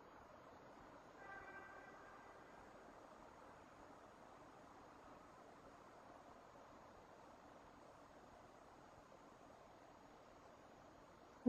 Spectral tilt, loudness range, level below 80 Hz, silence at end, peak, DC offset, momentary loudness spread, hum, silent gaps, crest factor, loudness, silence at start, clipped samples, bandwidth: -5 dB/octave; 4 LU; -78 dBFS; 0 s; -26 dBFS; under 0.1%; 6 LU; none; none; 32 dB; -62 LUFS; 0 s; under 0.1%; 11.5 kHz